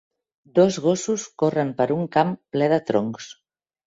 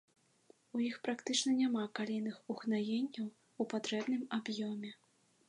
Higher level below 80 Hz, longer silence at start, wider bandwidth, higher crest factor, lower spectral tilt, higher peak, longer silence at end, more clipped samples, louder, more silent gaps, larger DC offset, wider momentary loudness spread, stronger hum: first, -64 dBFS vs -90 dBFS; second, 0.55 s vs 0.75 s; second, 8 kHz vs 11 kHz; about the same, 18 dB vs 20 dB; first, -5.5 dB/octave vs -4 dB/octave; first, -4 dBFS vs -18 dBFS; about the same, 0.55 s vs 0.55 s; neither; first, -22 LUFS vs -38 LUFS; neither; neither; about the same, 8 LU vs 10 LU; neither